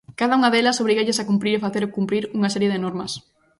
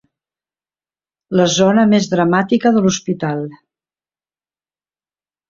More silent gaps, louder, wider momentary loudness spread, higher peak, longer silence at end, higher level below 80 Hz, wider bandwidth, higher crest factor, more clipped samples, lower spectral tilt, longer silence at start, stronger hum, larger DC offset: neither; second, -21 LUFS vs -15 LUFS; about the same, 10 LU vs 9 LU; second, -6 dBFS vs -2 dBFS; second, 0.4 s vs 1.95 s; second, -62 dBFS vs -56 dBFS; first, 11.5 kHz vs 7.6 kHz; about the same, 16 dB vs 16 dB; neither; about the same, -4.5 dB/octave vs -5 dB/octave; second, 0.1 s vs 1.3 s; neither; neither